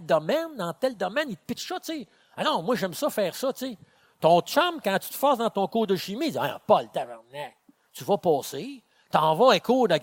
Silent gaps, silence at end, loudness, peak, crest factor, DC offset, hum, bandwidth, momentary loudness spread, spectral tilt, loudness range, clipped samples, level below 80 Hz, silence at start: none; 0 s; -25 LUFS; -6 dBFS; 20 dB; under 0.1%; none; 17 kHz; 16 LU; -4.5 dB/octave; 4 LU; under 0.1%; -72 dBFS; 0 s